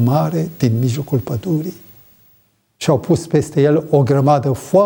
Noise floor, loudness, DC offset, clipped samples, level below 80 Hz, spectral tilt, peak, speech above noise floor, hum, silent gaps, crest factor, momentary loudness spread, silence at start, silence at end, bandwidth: -57 dBFS; -16 LUFS; under 0.1%; under 0.1%; -52 dBFS; -7.5 dB/octave; -2 dBFS; 42 dB; none; none; 14 dB; 7 LU; 0 s; 0 s; 16.5 kHz